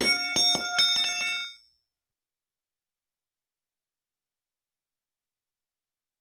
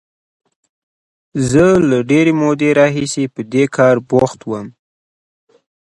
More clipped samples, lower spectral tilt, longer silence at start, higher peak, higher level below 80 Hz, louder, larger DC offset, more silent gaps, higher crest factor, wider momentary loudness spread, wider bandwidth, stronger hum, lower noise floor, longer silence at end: neither; second, 0 dB/octave vs -6 dB/octave; second, 0 s vs 1.35 s; second, -12 dBFS vs 0 dBFS; second, -68 dBFS vs -46 dBFS; second, -23 LUFS vs -14 LUFS; neither; neither; about the same, 20 dB vs 16 dB; second, 10 LU vs 14 LU; first, 19.5 kHz vs 11.5 kHz; neither; about the same, under -90 dBFS vs under -90 dBFS; first, 4.65 s vs 1.15 s